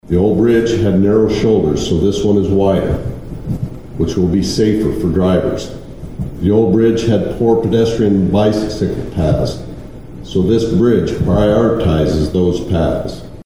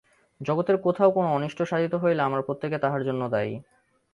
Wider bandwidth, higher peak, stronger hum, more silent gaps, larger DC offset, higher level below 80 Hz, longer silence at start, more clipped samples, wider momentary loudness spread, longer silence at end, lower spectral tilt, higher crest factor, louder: first, 13.5 kHz vs 11 kHz; first, 0 dBFS vs -6 dBFS; neither; neither; first, 2% vs under 0.1%; first, -30 dBFS vs -66 dBFS; second, 0 s vs 0.4 s; neither; first, 14 LU vs 8 LU; second, 0 s vs 0.5 s; about the same, -7.5 dB/octave vs -8 dB/octave; second, 12 dB vs 18 dB; first, -14 LUFS vs -25 LUFS